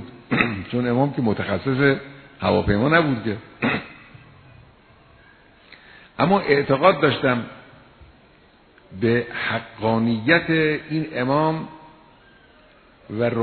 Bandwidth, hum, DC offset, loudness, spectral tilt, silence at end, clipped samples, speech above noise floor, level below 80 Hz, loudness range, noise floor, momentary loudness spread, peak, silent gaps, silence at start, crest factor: 4.6 kHz; none; under 0.1%; -21 LUFS; -10 dB/octave; 0 s; under 0.1%; 33 dB; -48 dBFS; 4 LU; -53 dBFS; 10 LU; 0 dBFS; none; 0 s; 22 dB